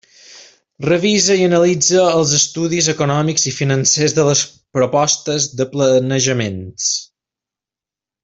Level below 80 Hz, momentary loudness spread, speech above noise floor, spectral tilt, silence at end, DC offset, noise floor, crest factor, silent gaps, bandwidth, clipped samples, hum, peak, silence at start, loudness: -54 dBFS; 6 LU; 73 dB; -3.5 dB/octave; 1.2 s; under 0.1%; -88 dBFS; 16 dB; none; 8.4 kHz; under 0.1%; none; -2 dBFS; 0.3 s; -15 LUFS